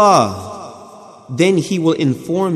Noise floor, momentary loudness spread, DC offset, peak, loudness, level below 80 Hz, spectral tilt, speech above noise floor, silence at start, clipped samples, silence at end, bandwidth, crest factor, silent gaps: -38 dBFS; 18 LU; under 0.1%; 0 dBFS; -16 LUFS; -62 dBFS; -5.5 dB/octave; 24 dB; 0 s; under 0.1%; 0 s; 14.5 kHz; 16 dB; none